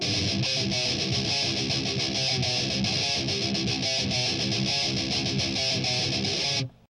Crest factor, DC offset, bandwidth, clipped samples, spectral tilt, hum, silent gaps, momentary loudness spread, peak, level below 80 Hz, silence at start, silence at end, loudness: 14 dB; under 0.1%; 11.5 kHz; under 0.1%; -3 dB/octave; none; none; 2 LU; -14 dBFS; -50 dBFS; 0 s; 0.25 s; -25 LUFS